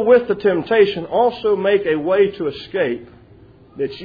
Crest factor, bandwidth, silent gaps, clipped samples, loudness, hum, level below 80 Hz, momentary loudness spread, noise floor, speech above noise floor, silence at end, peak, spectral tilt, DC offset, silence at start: 16 dB; 5 kHz; none; under 0.1%; -18 LUFS; none; -54 dBFS; 11 LU; -46 dBFS; 29 dB; 0 s; 0 dBFS; -8 dB/octave; under 0.1%; 0 s